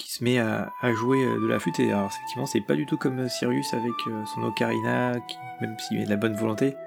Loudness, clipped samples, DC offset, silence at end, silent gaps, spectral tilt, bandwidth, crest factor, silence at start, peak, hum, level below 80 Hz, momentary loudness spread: -26 LUFS; under 0.1%; under 0.1%; 0 s; none; -5.5 dB/octave; 19.5 kHz; 18 dB; 0 s; -8 dBFS; none; -70 dBFS; 8 LU